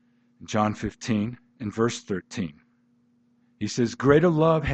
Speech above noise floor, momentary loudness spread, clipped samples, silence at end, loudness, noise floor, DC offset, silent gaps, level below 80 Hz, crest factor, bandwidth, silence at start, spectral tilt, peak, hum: 41 dB; 15 LU; under 0.1%; 0 s; -25 LUFS; -64 dBFS; under 0.1%; none; -54 dBFS; 20 dB; 8.8 kHz; 0.4 s; -6.5 dB/octave; -6 dBFS; none